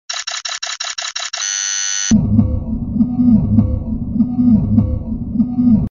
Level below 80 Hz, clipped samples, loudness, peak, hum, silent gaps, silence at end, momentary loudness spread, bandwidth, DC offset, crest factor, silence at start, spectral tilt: -28 dBFS; under 0.1%; -16 LUFS; 0 dBFS; none; none; 0 s; 9 LU; 7.6 kHz; under 0.1%; 16 dB; 0.1 s; -4.5 dB/octave